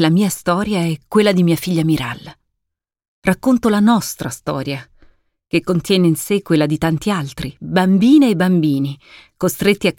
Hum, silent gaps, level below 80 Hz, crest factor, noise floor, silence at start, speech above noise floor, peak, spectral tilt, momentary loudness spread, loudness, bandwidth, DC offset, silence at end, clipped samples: none; 3.08-3.22 s; -46 dBFS; 14 dB; -79 dBFS; 0 s; 63 dB; -2 dBFS; -6 dB/octave; 11 LU; -16 LUFS; 17 kHz; under 0.1%; 0.05 s; under 0.1%